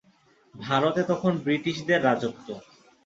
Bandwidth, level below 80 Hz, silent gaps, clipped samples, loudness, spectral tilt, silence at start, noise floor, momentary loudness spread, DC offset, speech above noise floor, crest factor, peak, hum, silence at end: 7.8 kHz; -66 dBFS; none; under 0.1%; -25 LUFS; -6 dB/octave; 0.55 s; -61 dBFS; 18 LU; under 0.1%; 36 dB; 20 dB; -6 dBFS; none; 0.45 s